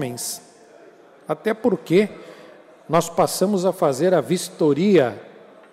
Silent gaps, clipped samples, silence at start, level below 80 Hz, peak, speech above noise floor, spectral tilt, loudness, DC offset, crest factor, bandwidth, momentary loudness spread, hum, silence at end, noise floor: none; under 0.1%; 0 s; -64 dBFS; -6 dBFS; 28 dB; -5.5 dB/octave; -20 LUFS; under 0.1%; 16 dB; 16 kHz; 13 LU; none; 0.45 s; -48 dBFS